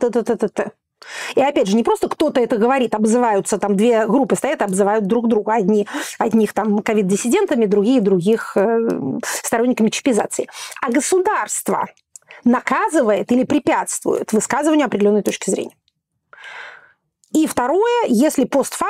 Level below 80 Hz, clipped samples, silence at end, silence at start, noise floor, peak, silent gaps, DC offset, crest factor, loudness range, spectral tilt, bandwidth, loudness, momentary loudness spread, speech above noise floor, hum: -58 dBFS; under 0.1%; 0 s; 0 s; -69 dBFS; -6 dBFS; none; under 0.1%; 12 dB; 3 LU; -5 dB/octave; 16.5 kHz; -17 LUFS; 7 LU; 52 dB; none